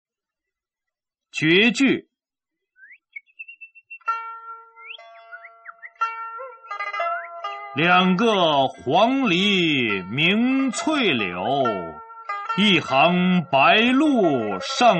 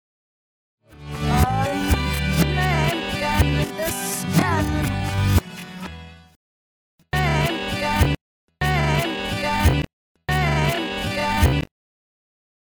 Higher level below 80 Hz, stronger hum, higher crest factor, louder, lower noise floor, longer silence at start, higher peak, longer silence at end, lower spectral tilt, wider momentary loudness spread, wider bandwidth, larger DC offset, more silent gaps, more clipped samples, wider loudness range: second, -64 dBFS vs -30 dBFS; neither; about the same, 18 dB vs 18 dB; about the same, -20 LUFS vs -21 LUFS; about the same, -87 dBFS vs under -90 dBFS; first, 1.35 s vs 0.9 s; about the same, -4 dBFS vs -4 dBFS; second, 0 s vs 1.1 s; about the same, -5 dB/octave vs -5 dB/octave; first, 23 LU vs 14 LU; second, 8.8 kHz vs over 20 kHz; neither; second, none vs 6.36-6.98 s, 8.21-8.48 s, 9.93-10.15 s; neither; first, 14 LU vs 3 LU